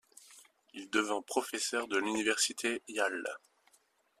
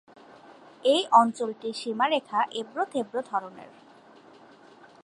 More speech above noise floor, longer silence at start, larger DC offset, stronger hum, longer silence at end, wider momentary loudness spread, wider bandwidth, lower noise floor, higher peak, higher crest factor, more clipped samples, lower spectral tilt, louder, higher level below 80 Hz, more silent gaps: first, 37 dB vs 27 dB; second, 0.3 s vs 0.85 s; neither; neither; second, 0.85 s vs 1.4 s; first, 19 LU vs 13 LU; first, 14.5 kHz vs 11.5 kHz; first, -71 dBFS vs -53 dBFS; second, -14 dBFS vs -6 dBFS; about the same, 22 dB vs 22 dB; neither; second, -1 dB/octave vs -3.5 dB/octave; second, -33 LUFS vs -26 LUFS; about the same, -80 dBFS vs -84 dBFS; neither